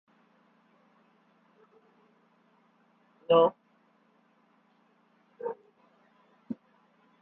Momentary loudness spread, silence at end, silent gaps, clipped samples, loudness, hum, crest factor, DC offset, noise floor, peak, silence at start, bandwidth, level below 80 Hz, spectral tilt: 22 LU; 0.65 s; none; under 0.1%; -29 LUFS; none; 26 dB; under 0.1%; -67 dBFS; -10 dBFS; 3.3 s; 3.8 kHz; -84 dBFS; -4.5 dB/octave